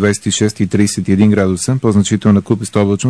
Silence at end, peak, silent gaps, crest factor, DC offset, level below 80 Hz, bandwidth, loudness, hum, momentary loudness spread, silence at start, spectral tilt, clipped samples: 0 s; 0 dBFS; none; 12 dB; 0.2%; -48 dBFS; 11 kHz; -13 LUFS; none; 3 LU; 0 s; -5.5 dB/octave; under 0.1%